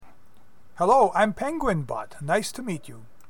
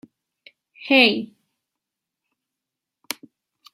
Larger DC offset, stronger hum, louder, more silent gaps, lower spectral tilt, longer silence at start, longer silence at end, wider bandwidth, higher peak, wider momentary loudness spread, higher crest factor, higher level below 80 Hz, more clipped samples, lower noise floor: first, 0.9% vs under 0.1%; neither; second, -24 LUFS vs -17 LUFS; neither; first, -5.5 dB/octave vs -3 dB/octave; second, 0 s vs 0.8 s; second, 0.3 s vs 2.5 s; about the same, 17.5 kHz vs 16 kHz; second, -8 dBFS vs -2 dBFS; second, 14 LU vs 23 LU; second, 18 dB vs 24 dB; first, -48 dBFS vs -76 dBFS; neither; second, -59 dBFS vs -85 dBFS